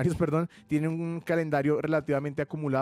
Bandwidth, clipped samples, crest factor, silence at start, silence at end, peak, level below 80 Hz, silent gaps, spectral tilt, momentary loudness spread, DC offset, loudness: 13 kHz; under 0.1%; 12 dB; 0 s; 0 s; -16 dBFS; -56 dBFS; none; -8 dB/octave; 5 LU; under 0.1%; -29 LUFS